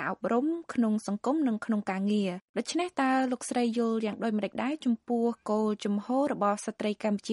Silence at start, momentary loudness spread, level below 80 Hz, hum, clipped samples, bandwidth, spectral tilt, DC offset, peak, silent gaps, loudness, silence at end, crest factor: 0 s; 4 LU; -76 dBFS; none; under 0.1%; 11.5 kHz; -5.5 dB/octave; under 0.1%; -14 dBFS; 2.42-2.54 s; -30 LUFS; 0 s; 14 dB